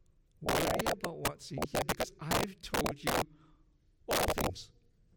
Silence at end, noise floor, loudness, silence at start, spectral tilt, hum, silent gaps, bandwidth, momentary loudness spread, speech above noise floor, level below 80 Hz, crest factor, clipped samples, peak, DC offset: 0.5 s; -66 dBFS; -34 LUFS; 0.4 s; -3.5 dB/octave; none; none; 17.5 kHz; 10 LU; 32 dB; -50 dBFS; 16 dB; under 0.1%; -20 dBFS; under 0.1%